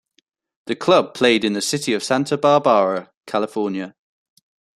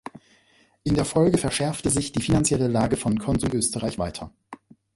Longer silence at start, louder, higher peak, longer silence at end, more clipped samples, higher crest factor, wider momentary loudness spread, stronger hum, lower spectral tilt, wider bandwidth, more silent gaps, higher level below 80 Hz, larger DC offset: first, 0.65 s vs 0.15 s; first, -19 LUFS vs -23 LUFS; first, -2 dBFS vs -6 dBFS; first, 0.9 s vs 0.4 s; neither; about the same, 18 dB vs 18 dB; about the same, 13 LU vs 11 LU; neither; about the same, -4 dB/octave vs -5 dB/octave; about the same, 13 kHz vs 12 kHz; first, 3.17-3.21 s vs none; second, -66 dBFS vs -42 dBFS; neither